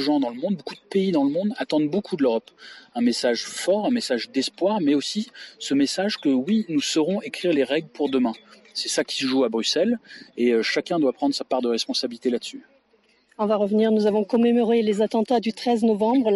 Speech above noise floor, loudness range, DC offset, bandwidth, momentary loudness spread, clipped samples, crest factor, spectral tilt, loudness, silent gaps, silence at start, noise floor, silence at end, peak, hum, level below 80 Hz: 40 dB; 2 LU; under 0.1%; 11.5 kHz; 8 LU; under 0.1%; 12 dB; -4.5 dB/octave; -23 LUFS; none; 0 s; -62 dBFS; 0 s; -10 dBFS; none; -70 dBFS